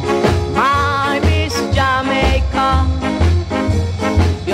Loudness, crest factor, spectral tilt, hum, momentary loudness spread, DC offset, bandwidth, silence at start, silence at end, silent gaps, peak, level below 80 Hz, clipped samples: -15 LUFS; 12 dB; -6 dB/octave; none; 3 LU; under 0.1%; 13 kHz; 0 s; 0 s; none; -2 dBFS; -22 dBFS; under 0.1%